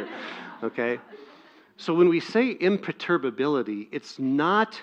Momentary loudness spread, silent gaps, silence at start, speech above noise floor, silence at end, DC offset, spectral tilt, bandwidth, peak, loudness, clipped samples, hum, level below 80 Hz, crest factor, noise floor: 15 LU; none; 0 s; 28 dB; 0 s; under 0.1%; -6.5 dB/octave; 8 kHz; -8 dBFS; -25 LUFS; under 0.1%; none; -78 dBFS; 18 dB; -53 dBFS